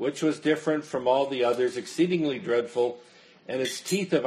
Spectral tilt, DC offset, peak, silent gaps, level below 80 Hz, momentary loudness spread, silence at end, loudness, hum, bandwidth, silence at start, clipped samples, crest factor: -5 dB/octave; under 0.1%; -10 dBFS; none; -74 dBFS; 5 LU; 0 s; -27 LUFS; none; 13 kHz; 0 s; under 0.1%; 18 dB